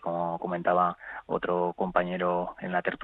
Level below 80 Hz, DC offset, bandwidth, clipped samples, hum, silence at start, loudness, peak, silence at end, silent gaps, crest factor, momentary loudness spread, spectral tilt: -60 dBFS; under 0.1%; 4.1 kHz; under 0.1%; none; 0 s; -29 LUFS; -8 dBFS; 0 s; none; 22 dB; 6 LU; -9.5 dB/octave